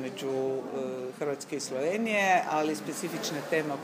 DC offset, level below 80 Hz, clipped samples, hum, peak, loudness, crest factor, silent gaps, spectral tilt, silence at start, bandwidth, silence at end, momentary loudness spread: under 0.1%; -82 dBFS; under 0.1%; none; -12 dBFS; -30 LUFS; 18 dB; none; -4 dB/octave; 0 s; 15.5 kHz; 0 s; 10 LU